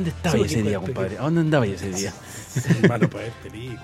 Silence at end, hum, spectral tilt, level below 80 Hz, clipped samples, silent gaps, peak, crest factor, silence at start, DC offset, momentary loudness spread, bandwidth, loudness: 0 s; none; -6 dB/octave; -48 dBFS; under 0.1%; none; -2 dBFS; 20 dB; 0 s; under 0.1%; 15 LU; 15.5 kHz; -23 LUFS